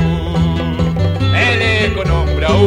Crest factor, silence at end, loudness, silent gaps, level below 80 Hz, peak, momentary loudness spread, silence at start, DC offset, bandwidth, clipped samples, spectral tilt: 14 dB; 0 s; -14 LUFS; none; -22 dBFS; 0 dBFS; 4 LU; 0 s; under 0.1%; 10 kHz; under 0.1%; -6.5 dB/octave